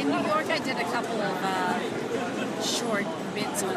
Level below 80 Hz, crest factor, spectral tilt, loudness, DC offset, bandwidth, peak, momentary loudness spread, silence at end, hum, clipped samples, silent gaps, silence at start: -66 dBFS; 16 dB; -3.5 dB/octave; -28 LUFS; under 0.1%; 15.5 kHz; -12 dBFS; 4 LU; 0 s; none; under 0.1%; none; 0 s